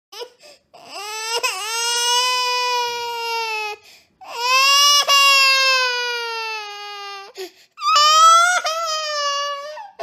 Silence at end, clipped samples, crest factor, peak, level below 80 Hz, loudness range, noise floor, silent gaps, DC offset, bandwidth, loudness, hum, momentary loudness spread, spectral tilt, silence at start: 0 s; under 0.1%; 16 dB; -2 dBFS; -78 dBFS; 6 LU; -47 dBFS; none; under 0.1%; 15.5 kHz; -16 LUFS; none; 22 LU; 3.5 dB/octave; 0.15 s